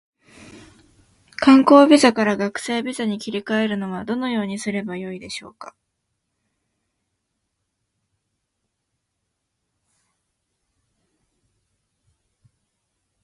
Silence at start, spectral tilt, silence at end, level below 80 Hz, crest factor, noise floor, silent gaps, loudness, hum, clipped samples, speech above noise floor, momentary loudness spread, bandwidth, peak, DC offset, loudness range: 0.55 s; -5 dB/octave; 7.55 s; -62 dBFS; 22 dB; -77 dBFS; none; -18 LUFS; none; under 0.1%; 59 dB; 20 LU; 11.5 kHz; 0 dBFS; under 0.1%; 19 LU